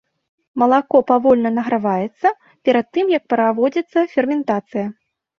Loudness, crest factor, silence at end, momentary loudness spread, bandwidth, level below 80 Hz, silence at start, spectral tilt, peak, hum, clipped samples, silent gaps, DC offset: -18 LUFS; 16 dB; 0.45 s; 8 LU; 6.8 kHz; -62 dBFS; 0.55 s; -7.5 dB/octave; -2 dBFS; none; under 0.1%; none; under 0.1%